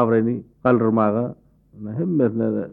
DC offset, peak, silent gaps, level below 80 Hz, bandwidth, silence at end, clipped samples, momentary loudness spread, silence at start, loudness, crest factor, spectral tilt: under 0.1%; -6 dBFS; none; -58 dBFS; 3.9 kHz; 0 s; under 0.1%; 12 LU; 0 s; -21 LUFS; 16 dB; -12 dB/octave